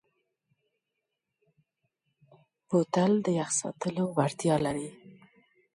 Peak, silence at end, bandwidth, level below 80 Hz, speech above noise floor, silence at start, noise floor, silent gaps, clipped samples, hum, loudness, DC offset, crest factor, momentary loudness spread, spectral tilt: -10 dBFS; 0.65 s; 11.5 kHz; -68 dBFS; 57 dB; 2.7 s; -85 dBFS; none; under 0.1%; none; -29 LUFS; under 0.1%; 22 dB; 8 LU; -5.5 dB/octave